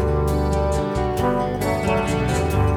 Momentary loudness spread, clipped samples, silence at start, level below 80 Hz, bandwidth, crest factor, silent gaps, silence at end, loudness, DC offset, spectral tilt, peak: 2 LU; under 0.1%; 0 s; -28 dBFS; 17 kHz; 12 dB; none; 0 s; -21 LUFS; under 0.1%; -6.5 dB/octave; -8 dBFS